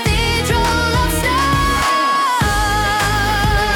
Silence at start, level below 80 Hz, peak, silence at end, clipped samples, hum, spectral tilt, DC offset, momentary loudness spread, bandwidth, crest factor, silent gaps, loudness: 0 s; -24 dBFS; -6 dBFS; 0 s; under 0.1%; none; -4 dB/octave; under 0.1%; 1 LU; 18 kHz; 10 dB; none; -15 LUFS